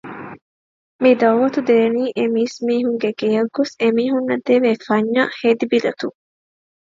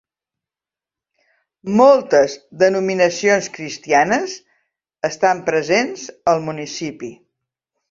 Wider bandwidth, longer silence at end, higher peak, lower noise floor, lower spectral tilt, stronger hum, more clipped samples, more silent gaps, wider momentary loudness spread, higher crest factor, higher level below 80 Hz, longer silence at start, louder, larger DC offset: about the same, 7.6 kHz vs 7.6 kHz; about the same, 0.75 s vs 0.75 s; about the same, -2 dBFS vs -2 dBFS; about the same, under -90 dBFS vs -90 dBFS; first, -6 dB/octave vs -4 dB/octave; neither; neither; first, 0.42-0.99 s vs none; second, 7 LU vs 16 LU; about the same, 16 dB vs 18 dB; second, -68 dBFS vs -62 dBFS; second, 0.05 s vs 1.65 s; about the same, -17 LUFS vs -17 LUFS; neither